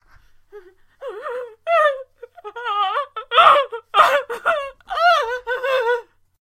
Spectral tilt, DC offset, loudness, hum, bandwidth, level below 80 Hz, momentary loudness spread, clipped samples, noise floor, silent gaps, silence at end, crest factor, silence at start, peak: -1 dB/octave; under 0.1%; -18 LUFS; none; 16 kHz; -58 dBFS; 18 LU; under 0.1%; -51 dBFS; none; 0.6 s; 20 dB; 0.55 s; 0 dBFS